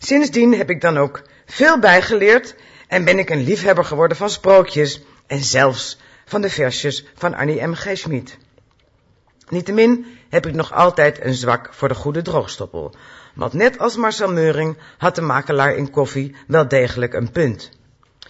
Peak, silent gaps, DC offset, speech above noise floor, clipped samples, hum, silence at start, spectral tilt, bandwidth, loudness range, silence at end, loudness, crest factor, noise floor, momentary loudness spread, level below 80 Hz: 0 dBFS; none; under 0.1%; 40 dB; under 0.1%; none; 0 s; -5 dB/octave; 8 kHz; 6 LU; 0.65 s; -17 LUFS; 16 dB; -57 dBFS; 14 LU; -50 dBFS